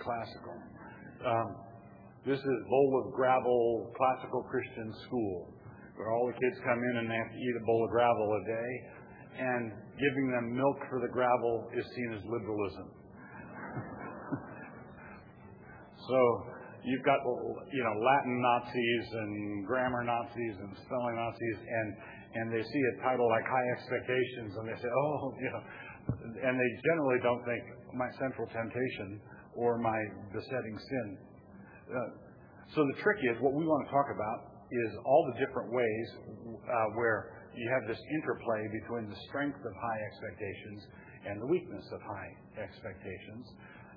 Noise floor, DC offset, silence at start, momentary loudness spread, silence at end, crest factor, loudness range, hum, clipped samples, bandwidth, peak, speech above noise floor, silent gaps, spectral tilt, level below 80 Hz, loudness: -54 dBFS; under 0.1%; 0 s; 19 LU; 0 s; 20 dB; 7 LU; none; under 0.1%; 5.2 kHz; -14 dBFS; 20 dB; none; -5 dB/octave; -66 dBFS; -34 LUFS